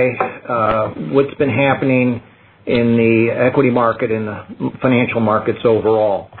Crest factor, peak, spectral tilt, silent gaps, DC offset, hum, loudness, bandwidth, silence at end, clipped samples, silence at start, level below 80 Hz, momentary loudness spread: 14 dB; -2 dBFS; -11.5 dB/octave; none; under 0.1%; none; -16 LUFS; 4.3 kHz; 0 s; under 0.1%; 0 s; -50 dBFS; 8 LU